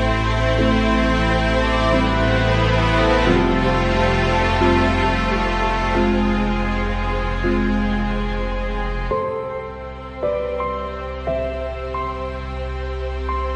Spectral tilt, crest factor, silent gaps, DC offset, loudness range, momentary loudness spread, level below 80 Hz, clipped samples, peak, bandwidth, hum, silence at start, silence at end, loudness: -6.5 dB/octave; 14 dB; none; under 0.1%; 8 LU; 10 LU; -26 dBFS; under 0.1%; -4 dBFS; 9.4 kHz; none; 0 s; 0 s; -20 LUFS